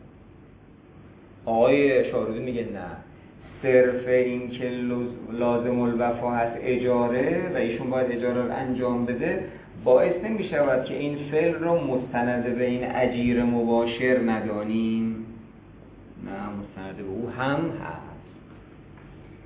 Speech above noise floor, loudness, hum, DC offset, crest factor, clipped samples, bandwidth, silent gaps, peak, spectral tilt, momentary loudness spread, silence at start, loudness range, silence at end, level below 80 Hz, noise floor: 26 dB; -25 LUFS; none; under 0.1%; 18 dB; under 0.1%; 4 kHz; none; -6 dBFS; -10.5 dB/octave; 16 LU; 0 s; 7 LU; 0 s; -52 dBFS; -50 dBFS